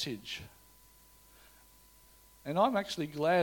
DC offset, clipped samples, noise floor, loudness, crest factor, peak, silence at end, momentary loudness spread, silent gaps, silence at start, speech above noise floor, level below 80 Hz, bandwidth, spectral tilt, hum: under 0.1%; under 0.1%; -61 dBFS; -33 LUFS; 20 dB; -14 dBFS; 0 s; 16 LU; none; 0 s; 29 dB; -66 dBFS; 17.5 kHz; -5 dB/octave; none